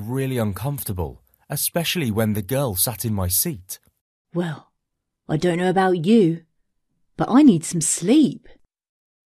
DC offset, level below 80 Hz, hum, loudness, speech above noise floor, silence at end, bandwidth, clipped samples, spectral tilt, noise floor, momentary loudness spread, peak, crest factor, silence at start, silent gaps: under 0.1%; -50 dBFS; none; -20 LUFS; 58 dB; 0.95 s; 14 kHz; under 0.1%; -5 dB/octave; -78 dBFS; 15 LU; -4 dBFS; 18 dB; 0 s; 4.01-4.25 s